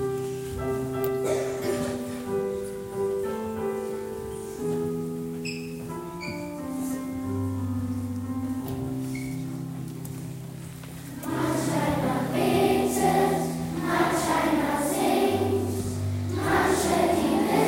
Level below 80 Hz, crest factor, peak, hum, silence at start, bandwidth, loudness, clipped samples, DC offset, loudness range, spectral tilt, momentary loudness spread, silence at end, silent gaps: -52 dBFS; 18 dB; -10 dBFS; none; 0 s; 16.5 kHz; -27 LUFS; under 0.1%; under 0.1%; 8 LU; -5.5 dB/octave; 12 LU; 0 s; none